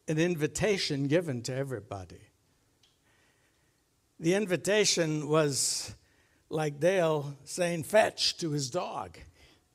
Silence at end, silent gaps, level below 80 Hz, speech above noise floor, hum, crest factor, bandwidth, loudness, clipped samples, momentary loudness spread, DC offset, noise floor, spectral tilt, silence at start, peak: 0.5 s; none; -62 dBFS; 42 dB; none; 20 dB; 16 kHz; -29 LUFS; under 0.1%; 13 LU; under 0.1%; -71 dBFS; -4 dB/octave; 0.05 s; -10 dBFS